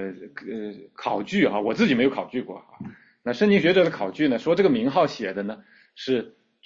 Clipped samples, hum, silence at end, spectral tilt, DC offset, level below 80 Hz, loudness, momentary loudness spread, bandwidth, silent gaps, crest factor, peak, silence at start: under 0.1%; none; 0.35 s; -6.5 dB/octave; under 0.1%; -64 dBFS; -23 LUFS; 20 LU; 7.6 kHz; none; 18 dB; -6 dBFS; 0 s